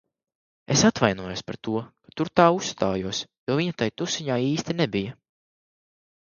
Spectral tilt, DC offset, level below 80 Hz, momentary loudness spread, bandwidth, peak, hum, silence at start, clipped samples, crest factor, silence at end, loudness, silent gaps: -4.5 dB/octave; under 0.1%; -56 dBFS; 12 LU; 7.4 kHz; -2 dBFS; none; 0.7 s; under 0.1%; 22 dB; 1.1 s; -24 LUFS; 3.38-3.47 s